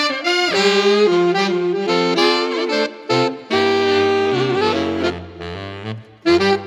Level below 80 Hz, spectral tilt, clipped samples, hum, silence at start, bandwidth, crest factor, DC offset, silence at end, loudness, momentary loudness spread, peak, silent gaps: -54 dBFS; -4.5 dB/octave; under 0.1%; none; 0 s; 13 kHz; 16 dB; under 0.1%; 0 s; -17 LUFS; 15 LU; -2 dBFS; none